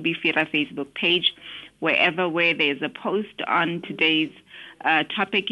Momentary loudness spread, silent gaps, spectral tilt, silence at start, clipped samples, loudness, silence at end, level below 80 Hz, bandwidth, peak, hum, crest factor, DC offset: 9 LU; none; -5.5 dB/octave; 0 s; under 0.1%; -22 LUFS; 0 s; -68 dBFS; 11.5 kHz; -6 dBFS; none; 18 dB; under 0.1%